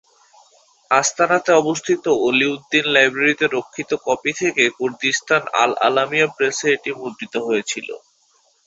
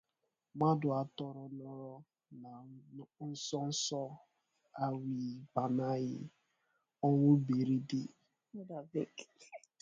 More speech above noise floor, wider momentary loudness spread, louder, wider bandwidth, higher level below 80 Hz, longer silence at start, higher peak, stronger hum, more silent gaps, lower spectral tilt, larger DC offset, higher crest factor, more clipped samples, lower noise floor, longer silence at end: second, 41 dB vs 50 dB; second, 10 LU vs 23 LU; first, -18 LUFS vs -36 LUFS; about the same, 8.2 kHz vs 8.8 kHz; first, -64 dBFS vs -78 dBFS; first, 0.9 s vs 0.55 s; first, 0 dBFS vs -18 dBFS; neither; neither; second, -2.5 dB/octave vs -6.5 dB/octave; neither; about the same, 18 dB vs 20 dB; neither; second, -60 dBFS vs -86 dBFS; first, 0.7 s vs 0.25 s